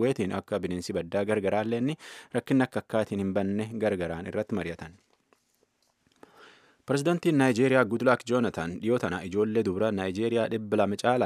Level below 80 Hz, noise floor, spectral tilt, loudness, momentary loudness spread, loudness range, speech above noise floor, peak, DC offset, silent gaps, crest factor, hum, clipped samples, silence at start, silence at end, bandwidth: -62 dBFS; -71 dBFS; -6.5 dB/octave; -28 LUFS; 9 LU; 8 LU; 44 dB; -6 dBFS; under 0.1%; none; 22 dB; none; under 0.1%; 0 s; 0 s; 14.5 kHz